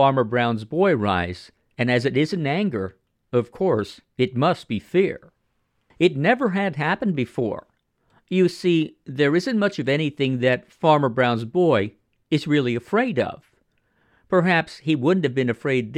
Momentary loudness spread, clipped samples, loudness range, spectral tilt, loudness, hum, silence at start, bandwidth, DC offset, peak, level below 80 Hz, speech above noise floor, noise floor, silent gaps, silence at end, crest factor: 7 LU; under 0.1%; 3 LU; -7 dB/octave; -22 LUFS; none; 0 s; 11 kHz; under 0.1%; -4 dBFS; -60 dBFS; 49 dB; -70 dBFS; none; 0 s; 18 dB